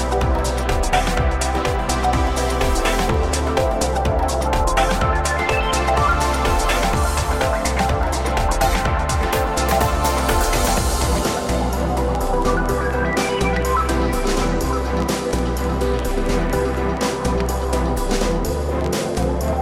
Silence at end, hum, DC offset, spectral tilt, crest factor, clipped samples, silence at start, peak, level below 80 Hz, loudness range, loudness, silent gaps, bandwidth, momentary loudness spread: 0 s; none; under 0.1%; -4.5 dB/octave; 16 dB; under 0.1%; 0 s; -4 dBFS; -22 dBFS; 2 LU; -20 LUFS; none; 16.5 kHz; 3 LU